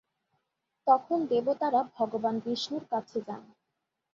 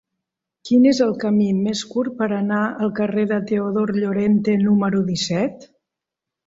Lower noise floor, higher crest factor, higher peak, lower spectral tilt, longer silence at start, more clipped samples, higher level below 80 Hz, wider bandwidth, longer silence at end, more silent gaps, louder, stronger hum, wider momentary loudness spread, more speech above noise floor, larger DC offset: about the same, -84 dBFS vs -85 dBFS; first, 20 dB vs 14 dB; second, -10 dBFS vs -6 dBFS; about the same, -5.5 dB/octave vs -6 dB/octave; first, 0.85 s vs 0.65 s; neither; second, -78 dBFS vs -60 dBFS; about the same, 7.6 kHz vs 7.8 kHz; second, 0.7 s vs 0.85 s; neither; second, -30 LUFS vs -19 LUFS; neither; first, 11 LU vs 6 LU; second, 55 dB vs 66 dB; neither